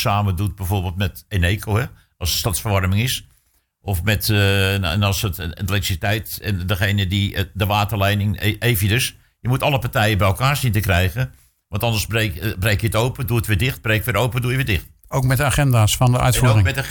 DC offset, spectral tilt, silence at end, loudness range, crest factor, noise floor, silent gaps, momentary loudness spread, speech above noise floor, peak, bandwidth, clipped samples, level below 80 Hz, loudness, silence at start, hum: under 0.1%; -5 dB/octave; 0 s; 2 LU; 14 dB; -62 dBFS; none; 8 LU; 43 dB; -6 dBFS; 19.5 kHz; under 0.1%; -36 dBFS; -19 LUFS; 0 s; none